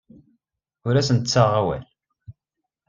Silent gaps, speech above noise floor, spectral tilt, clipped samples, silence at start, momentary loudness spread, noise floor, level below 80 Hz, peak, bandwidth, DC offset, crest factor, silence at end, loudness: none; 64 dB; -5.5 dB/octave; under 0.1%; 0.85 s; 13 LU; -83 dBFS; -54 dBFS; -2 dBFS; 7.6 kHz; under 0.1%; 22 dB; 0.6 s; -21 LUFS